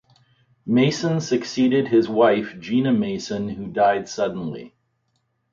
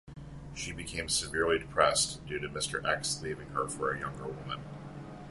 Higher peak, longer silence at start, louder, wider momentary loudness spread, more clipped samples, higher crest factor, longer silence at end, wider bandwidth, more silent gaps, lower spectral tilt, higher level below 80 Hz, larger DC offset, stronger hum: about the same, -6 dBFS vs -8 dBFS; first, 0.65 s vs 0.05 s; first, -21 LUFS vs -32 LUFS; second, 10 LU vs 18 LU; neither; second, 16 dB vs 26 dB; first, 0.85 s vs 0 s; second, 7.6 kHz vs 12 kHz; neither; first, -6 dB/octave vs -2.5 dB/octave; second, -60 dBFS vs -52 dBFS; neither; neither